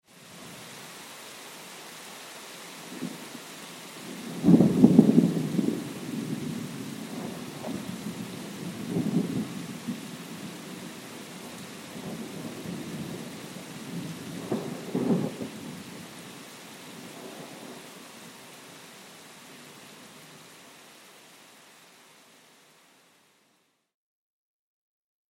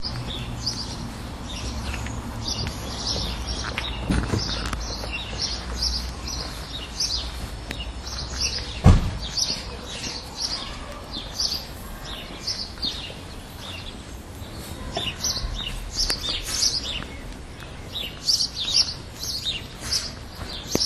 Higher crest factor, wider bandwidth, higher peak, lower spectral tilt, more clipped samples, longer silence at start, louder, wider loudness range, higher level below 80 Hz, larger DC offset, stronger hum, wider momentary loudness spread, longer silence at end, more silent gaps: about the same, 30 dB vs 28 dB; first, 16.5 kHz vs 13.5 kHz; about the same, -2 dBFS vs 0 dBFS; first, -6 dB/octave vs -3 dB/octave; neither; first, 0.15 s vs 0 s; second, -30 LUFS vs -26 LUFS; first, 23 LU vs 6 LU; second, -70 dBFS vs -34 dBFS; neither; neither; first, 19 LU vs 14 LU; first, 3.2 s vs 0 s; neither